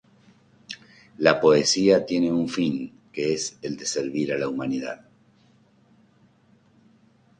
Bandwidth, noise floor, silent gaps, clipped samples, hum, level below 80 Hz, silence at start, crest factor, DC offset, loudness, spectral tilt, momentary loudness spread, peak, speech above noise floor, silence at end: 10.5 kHz; -59 dBFS; none; under 0.1%; none; -64 dBFS; 0.7 s; 24 dB; under 0.1%; -23 LUFS; -4 dB/octave; 20 LU; 0 dBFS; 37 dB; 2.45 s